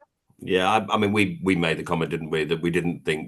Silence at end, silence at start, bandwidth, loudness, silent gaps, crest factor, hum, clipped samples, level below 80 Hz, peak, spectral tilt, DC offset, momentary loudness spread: 0 s; 0.4 s; 12.5 kHz; -23 LUFS; none; 20 dB; none; under 0.1%; -56 dBFS; -4 dBFS; -5.5 dB/octave; under 0.1%; 5 LU